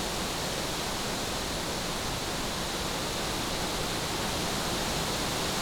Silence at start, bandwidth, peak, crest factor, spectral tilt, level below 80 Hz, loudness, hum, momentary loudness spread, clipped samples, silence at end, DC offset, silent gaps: 0 s; over 20 kHz; -18 dBFS; 14 dB; -3 dB/octave; -44 dBFS; -30 LUFS; none; 2 LU; under 0.1%; 0 s; under 0.1%; none